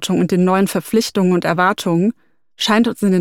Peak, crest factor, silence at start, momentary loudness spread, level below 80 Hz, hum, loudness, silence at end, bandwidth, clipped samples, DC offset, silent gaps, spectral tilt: 0 dBFS; 14 dB; 0 s; 3 LU; -56 dBFS; none; -16 LUFS; 0 s; 17 kHz; under 0.1%; under 0.1%; none; -5.5 dB/octave